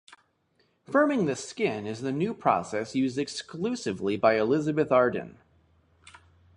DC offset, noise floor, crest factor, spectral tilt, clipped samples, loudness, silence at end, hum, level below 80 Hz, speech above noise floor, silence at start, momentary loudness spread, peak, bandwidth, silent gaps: under 0.1%; -70 dBFS; 20 dB; -5.5 dB/octave; under 0.1%; -27 LUFS; 1.25 s; none; -64 dBFS; 43 dB; 0.9 s; 9 LU; -8 dBFS; 11 kHz; none